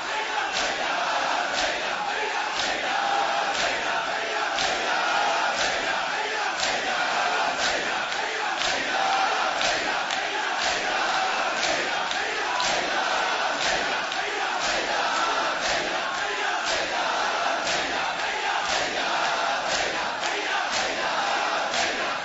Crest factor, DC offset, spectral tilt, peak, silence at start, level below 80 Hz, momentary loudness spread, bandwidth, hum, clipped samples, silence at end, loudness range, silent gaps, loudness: 18 dB; under 0.1%; -0.5 dB/octave; -6 dBFS; 0 s; -58 dBFS; 3 LU; 8 kHz; none; under 0.1%; 0 s; 1 LU; none; -24 LUFS